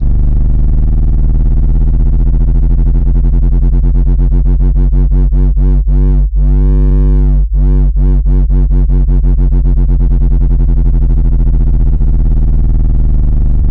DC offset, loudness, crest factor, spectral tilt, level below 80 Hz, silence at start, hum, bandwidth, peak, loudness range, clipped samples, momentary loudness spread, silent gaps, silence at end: under 0.1%; -12 LUFS; 4 dB; -12 dB/octave; -8 dBFS; 0 s; none; 1.6 kHz; -4 dBFS; 1 LU; under 0.1%; 2 LU; none; 0 s